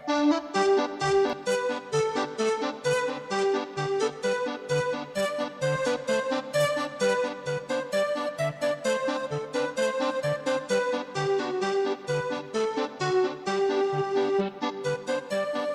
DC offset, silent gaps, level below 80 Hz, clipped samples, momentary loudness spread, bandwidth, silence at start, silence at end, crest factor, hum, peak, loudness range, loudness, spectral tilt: under 0.1%; none; -66 dBFS; under 0.1%; 5 LU; 13.5 kHz; 0 s; 0 s; 16 dB; none; -10 dBFS; 2 LU; -27 LUFS; -4.5 dB/octave